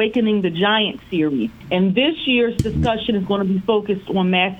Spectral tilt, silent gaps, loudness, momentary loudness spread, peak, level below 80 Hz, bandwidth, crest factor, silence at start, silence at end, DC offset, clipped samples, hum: -6.5 dB/octave; none; -19 LUFS; 4 LU; -4 dBFS; -40 dBFS; 9.6 kHz; 14 dB; 0 s; 0 s; under 0.1%; under 0.1%; none